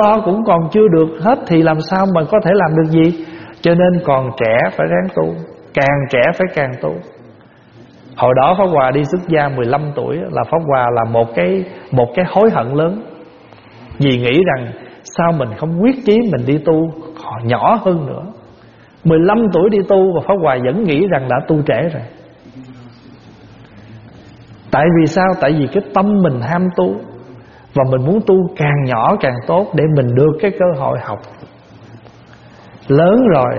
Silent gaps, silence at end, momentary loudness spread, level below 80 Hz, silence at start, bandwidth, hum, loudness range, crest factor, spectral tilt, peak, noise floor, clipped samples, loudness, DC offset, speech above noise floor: none; 0 s; 10 LU; -46 dBFS; 0 s; 7 kHz; none; 4 LU; 14 dB; -6.5 dB/octave; 0 dBFS; -43 dBFS; under 0.1%; -14 LUFS; under 0.1%; 30 dB